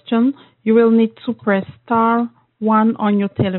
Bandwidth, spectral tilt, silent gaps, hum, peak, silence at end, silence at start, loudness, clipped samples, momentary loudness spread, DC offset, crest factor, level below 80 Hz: 4.2 kHz; -6.5 dB/octave; none; none; -2 dBFS; 0 s; 0.1 s; -17 LUFS; under 0.1%; 9 LU; under 0.1%; 14 dB; -58 dBFS